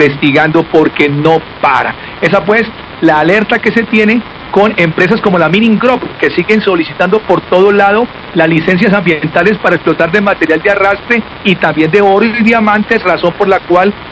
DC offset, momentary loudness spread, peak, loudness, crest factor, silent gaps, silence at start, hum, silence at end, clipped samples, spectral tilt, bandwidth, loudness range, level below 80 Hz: under 0.1%; 4 LU; 0 dBFS; -9 LUFS; 10 dB; none; 0 s; none; 0 s; 2%; -7 dB/octave; 8 kHz; 1 LU; -40 dBFS